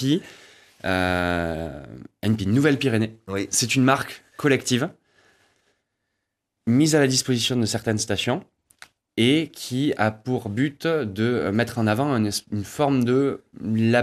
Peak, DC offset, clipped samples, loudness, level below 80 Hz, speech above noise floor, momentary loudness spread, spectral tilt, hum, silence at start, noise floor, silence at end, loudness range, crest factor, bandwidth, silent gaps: -4 dBFS; under 0.1%; under 0.1%; -23 LUFS; -54 dBFS; 57 dB; 11 LU; -5 dB/octave; none; 0 s; -80 dBFS; 0 s; 2 LU; 20 dB; 14.5 kHz; none